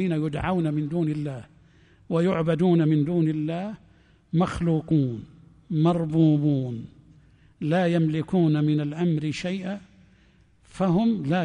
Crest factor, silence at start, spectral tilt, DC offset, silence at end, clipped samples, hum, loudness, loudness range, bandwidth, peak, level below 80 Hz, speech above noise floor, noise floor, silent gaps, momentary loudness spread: 14 dB; 0 s; -8.5 dB/octave; under 0.1%; 0 s; under 0.1%; none; -24 LUFS; 2 LU; 10 kHz; -10 dBFS; -52 dBFS; 35 dB; -58 dBFS; none; 12 LU